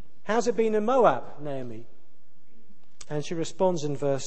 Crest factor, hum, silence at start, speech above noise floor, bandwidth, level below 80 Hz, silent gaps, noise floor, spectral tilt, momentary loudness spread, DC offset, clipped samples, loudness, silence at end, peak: 20 dB; none; 0.25 s; 40 dB; 8.8 kHz; -62 dBFS; none; -66 dBFS; -5.5 dB/octave; 15 LU; 3%; under 0.1%; -27 LUFS; 0 s; -6 dBFS